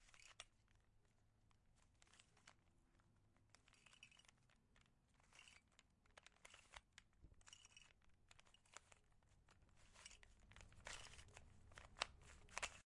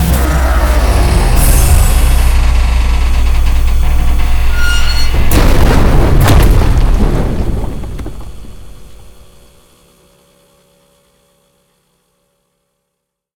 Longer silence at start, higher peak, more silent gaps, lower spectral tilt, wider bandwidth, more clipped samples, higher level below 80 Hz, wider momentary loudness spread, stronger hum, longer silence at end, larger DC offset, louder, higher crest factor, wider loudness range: about the same, 0 s vs 0 s; second, -24 dBFS vs 0 dBFS; neither; second, -1 dB/octave vs -5 dB/octave; second, 11 kHz vs 20 kHz; second, under 0.1% vs 0.5%; second, -74 dBFS vs -12 dBFS; first, 17 LU vs 11 LU; neither; second, 0.15 s vs 4.35 s; neither; second, -59 LUFS vs -12 LUFS; first, 40 dB vs 10 dB; about the same, 11 LU vs 11 LU